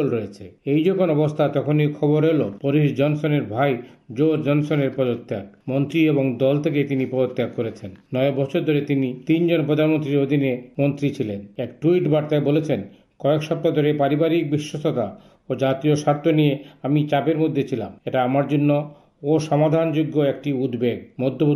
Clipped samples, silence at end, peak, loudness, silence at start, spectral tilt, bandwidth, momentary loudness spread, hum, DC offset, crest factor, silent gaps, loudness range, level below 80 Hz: under 0.1%; 0 s; -8 dBFS; -21 LUFS; 0 s; -8 dB/octave; 13.5 kHz; 9 LU; none; under 0.1%; 14 dB; none; 2 LU; -64 dBFS